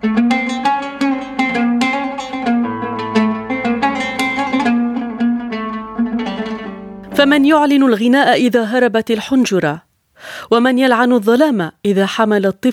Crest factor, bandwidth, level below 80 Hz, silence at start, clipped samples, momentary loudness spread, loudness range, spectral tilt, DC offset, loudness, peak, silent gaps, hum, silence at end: 14 dB; 14.5 kHz; -52 dBFS; 0 s; under 0.1%; 11 LU; 5 LU; -5 dB/octave; under 0.1%; -15 LUFS; 0 dBFS; none; none; 0 s